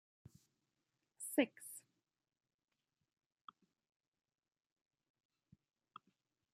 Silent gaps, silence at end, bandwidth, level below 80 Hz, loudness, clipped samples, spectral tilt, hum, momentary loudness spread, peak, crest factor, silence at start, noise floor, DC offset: none; 4.75 s; 15 kHz; under -90 dBFS; -41 LUFS; under 0.1%; -3 dB/octave; none; 25 LU; -20 dBFS; 30 dB; 1.2 s; under -90 dBFS; under 0.1%